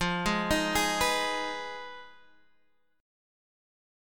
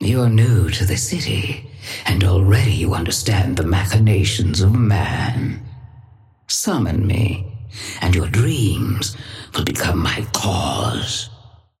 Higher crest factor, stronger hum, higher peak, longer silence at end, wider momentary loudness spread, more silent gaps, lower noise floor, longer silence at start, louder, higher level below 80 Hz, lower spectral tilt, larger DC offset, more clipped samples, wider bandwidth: first, 20 dB vs 14 dB; neither; second, -12 dBFS vs -4 dBFS; first, 1 s vs 0.45 s; first, 16 LU vs 11 LU; neither; first, -72 dBFS vs -47 dBFS; about the same, 0 s vs 0 s; second, -28 LUFS vs -18 LUFS; second, -48 dBFS vs -34 dBFS; second, -3 dB/octave vs -5 dB/octave; neither; neither; first, 17.5 kHz vs 15.5 kHz